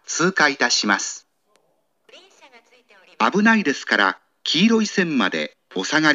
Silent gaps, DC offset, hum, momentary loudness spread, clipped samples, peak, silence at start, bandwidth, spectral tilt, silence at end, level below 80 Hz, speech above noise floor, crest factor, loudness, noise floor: none; under 0.1%; none; 11 LU; under 0.1%; 0 dBFS; 0.1 s; 8 kHz; -3 dB/octave; 0 s; -80 dBFS; 49 dB; 20 dB; -19 LUFS; -67 dBFS